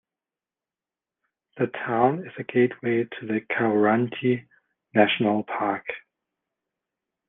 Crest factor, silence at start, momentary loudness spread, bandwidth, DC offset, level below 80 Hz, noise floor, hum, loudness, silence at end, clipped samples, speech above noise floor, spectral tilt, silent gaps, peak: 22 dB; 1.55 s; 9 LU; 3.9 kHz; under 0.1%; -72 dBFS; under -90 dBFS; none; -24 LUFS; 1.3 s; under 0.1%; over 66 dB; -9.5 dB/octave; none; -4 dBFS